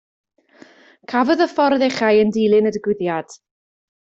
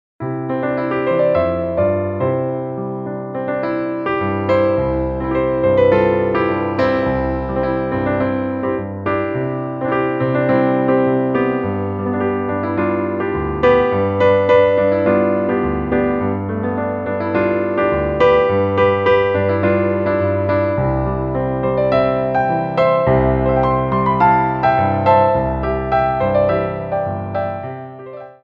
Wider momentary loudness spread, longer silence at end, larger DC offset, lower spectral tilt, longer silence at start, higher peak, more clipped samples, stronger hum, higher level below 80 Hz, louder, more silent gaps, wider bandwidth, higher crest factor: about the same, 8 LU vs 8 LU; first, 0.75 s vs 0.1 s; neither; second, -5.5 dB/octave vs -9.5 dB/octave; first, 1.1 s vs 0.2 s; about the same, -4 dBFS vs -2 dBFS; neither; neither; second, -62 dBFS vs -36 dBFS; about the same, -17 LUFS vs -17 LUFS; neither; first, 7.8 kHz vs 5.6 kHz; about the same, 16 dB vs 16 dB